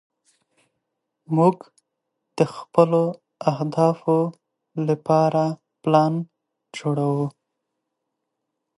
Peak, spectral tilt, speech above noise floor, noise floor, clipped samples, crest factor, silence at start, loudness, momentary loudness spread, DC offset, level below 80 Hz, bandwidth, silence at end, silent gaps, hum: -2 dBFS; -8 dB/octave; 60 dB; -80 dBFS; under 0.1%; 22 dB; 1.3 s; -22 LUFS; 11 LU; under 0.1%; -74 dBFS; 11.5 kHz; 1.5 s; none; none